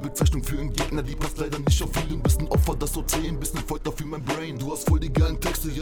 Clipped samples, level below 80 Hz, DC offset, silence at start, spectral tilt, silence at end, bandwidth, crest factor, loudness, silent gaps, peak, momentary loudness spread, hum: under 0.1%; -28 dBFS; under 0.1%; 0 s; -5 dB/octave; 0 s; over 20 kHz; 20 dB; -26 LUFS; none; -4 dBFS; 7 LU; none